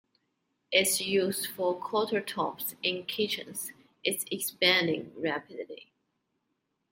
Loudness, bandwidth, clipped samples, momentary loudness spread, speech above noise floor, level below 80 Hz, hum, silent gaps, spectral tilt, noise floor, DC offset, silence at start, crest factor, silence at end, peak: -29 LUFS; 16.5 kHz; under 0.1%; 14 LU; 49 dB; -78 dBFS; none; none; -2.5 dB/octave; -80 dBFS; under 0.1%; 0.7 s; 24 dB; 1.1 s; -8 dBFS